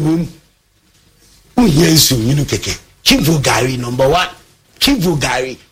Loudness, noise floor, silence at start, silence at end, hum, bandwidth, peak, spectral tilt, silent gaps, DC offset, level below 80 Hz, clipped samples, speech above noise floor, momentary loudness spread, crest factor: -13 LUFS; -54 dBFS; 0 s; 0.15 s; none; 16.5 kHz; 0 dBFS; -4 dB/octave; none; under 0.1%; -34 dBFS; under 0.1%; 41 dB; 10 LU; 14 dB